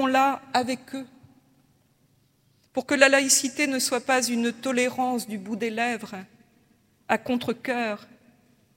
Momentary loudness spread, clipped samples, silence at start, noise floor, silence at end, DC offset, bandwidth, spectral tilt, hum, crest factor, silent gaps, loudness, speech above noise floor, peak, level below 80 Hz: 15 LU; under 0.1%; 0 s; -65 dBFS; 0.7 s; under 0.1%; 16.5 kHz; -2 dB/octave; none; 24 dB; none; -24 LUFS; 40 dB; -2 dBFS; -74 dBFS